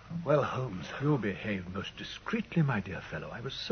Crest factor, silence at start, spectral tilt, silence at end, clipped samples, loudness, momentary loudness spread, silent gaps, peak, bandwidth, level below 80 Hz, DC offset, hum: 18 dB; 0 s; -7 dB/octave; 0 s; under 0.1%; -33 LUFS; 10 LU; none; -14 dBFS; 6.6 kHz; -58 dBFS; under 0.1%; none